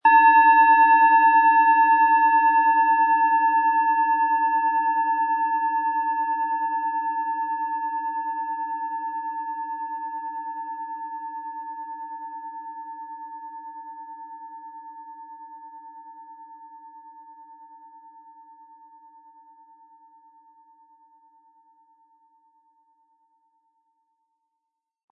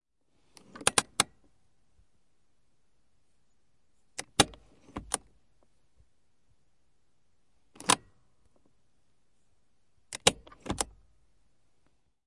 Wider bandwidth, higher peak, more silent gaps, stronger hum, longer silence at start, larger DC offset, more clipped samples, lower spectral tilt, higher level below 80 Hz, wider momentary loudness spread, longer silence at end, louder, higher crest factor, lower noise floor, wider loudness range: second, 4 kHz vs 11.5 kHz; second, -6 dBFS vs -2 dBFS; neither; neither; second, 0.05 s vs 0.8 s; neither; neither; first, -4.5 dB/octave vs -1.5 dB/octave; second, -84 dBFS vs -58 dBFS; first, 25 LU vs 17 LU; first, 7.45 s vs 1.45 s; first, -20 LUFS vs -29 LUFS; second, 18 dB vs 34 dB; first, -83 dBFS vs -77 dBFS; first, 25 LU vs 5 LU